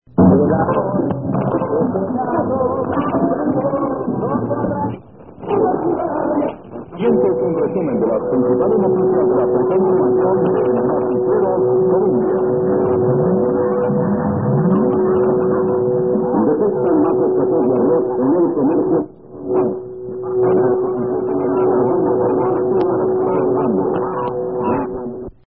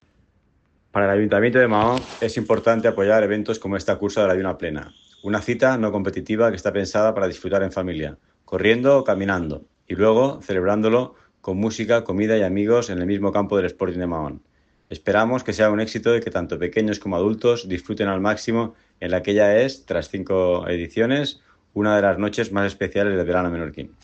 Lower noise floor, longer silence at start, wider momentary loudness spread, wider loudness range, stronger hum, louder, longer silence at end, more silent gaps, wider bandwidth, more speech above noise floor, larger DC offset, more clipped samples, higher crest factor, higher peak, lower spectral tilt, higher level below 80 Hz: second, -36 dBFS vs -63 dBFS; second, 0.15 s vs 0.95 s; second, 6 LU vs 11 LU; about the same, 4 LU vs 3 LU; neither; first, -17 LUFS vs -21 LUFS; about the same, 0.15 s vs 0.15 s; neither; second, 3.3 kHz vs 8.4 kHz; second, 21 dB vs 42 dB; first, 0.3% vs under 0.1%; neither; about the same, 16 dB vs 18 dB; first, 0 dBFS vs -4 dBFS; first, -14.5 dB/octave vs -6 dB/octave; first, -44 dBFS vs -50 dBFS